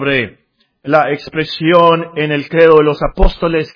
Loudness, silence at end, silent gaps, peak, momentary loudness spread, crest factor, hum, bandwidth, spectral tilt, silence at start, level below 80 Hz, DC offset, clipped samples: -12 LUFS; 0.05 s; none; 0 dBFS; 10 LU; 12 dB; none; 5.4 kHz; -8 dB/octave; 0 s; -22 dBFS; under 0.1%; 0.7%